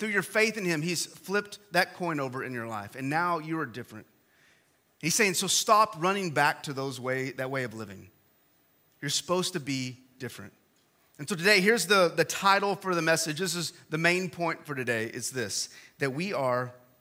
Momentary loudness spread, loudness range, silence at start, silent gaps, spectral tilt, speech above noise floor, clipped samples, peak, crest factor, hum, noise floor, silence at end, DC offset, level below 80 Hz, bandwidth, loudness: 15 LU; 8 LU; 0 s; none; -3 dB/octave; 38 dB; under 0.1%; -8 dBFS; 22 dB; none; -67 dBFS; 0.25 s; under 0.1%; -78 dBFS; 16.5 kHz; -28 LUFS